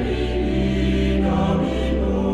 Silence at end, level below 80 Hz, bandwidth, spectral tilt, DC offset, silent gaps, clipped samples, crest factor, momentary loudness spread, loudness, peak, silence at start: 0 s; -26 dBFS; 9 kHz; -7.5 dB/octave; under 0.1%; none; under 0.1%; 12 dB; 2 LU; -21 LUFS; -8 dBFS; 0 s